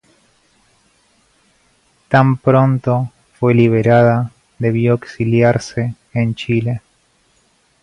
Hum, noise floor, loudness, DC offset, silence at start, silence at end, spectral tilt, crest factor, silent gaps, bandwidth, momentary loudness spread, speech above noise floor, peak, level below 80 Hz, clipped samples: none; -58 dBFS; -15 LUFS; under 0.1%; 2.1 s; 1.05 s; -8 dB/octave; 16 dB; none; 10 kHz; 11 LU; 44 dB; 0 dBFS; -50 dBFS; under 0.1%